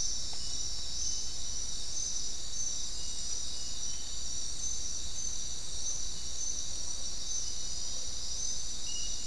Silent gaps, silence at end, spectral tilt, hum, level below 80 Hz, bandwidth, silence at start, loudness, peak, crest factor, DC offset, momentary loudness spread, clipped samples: none; 0 s; 0 dB/octave; none; -48 dBFS; 12 kHz; 0 s; -35 LUFS; -20 dBFS; 16 dB; 3%; 3 LU; under 0.1%